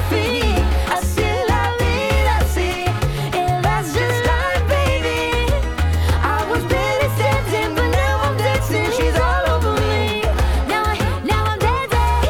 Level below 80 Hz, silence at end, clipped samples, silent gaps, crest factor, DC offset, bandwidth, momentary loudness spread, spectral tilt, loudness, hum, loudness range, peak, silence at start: -24 dBFS; 0 s; under 0.1%; none; 8 dB; under 0.1%; 17.5 kHz; 2 LU; -5.5 dB/octave; -18 LUFS; none; 1 LU; -8 dBFS; 0 s